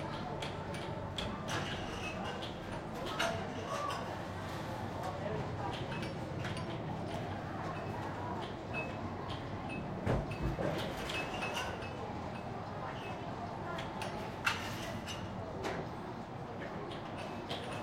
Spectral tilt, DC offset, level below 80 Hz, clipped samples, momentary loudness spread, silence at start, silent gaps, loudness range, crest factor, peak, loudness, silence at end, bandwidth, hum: -5 dB/octave; under 0.1%; -54 dBFS; under 0.1%; 6 LU; 0 s; none; 2 LU; 22 dB; -18 dBFS; -40 LUFS; 0 s; 16.5 kHz; none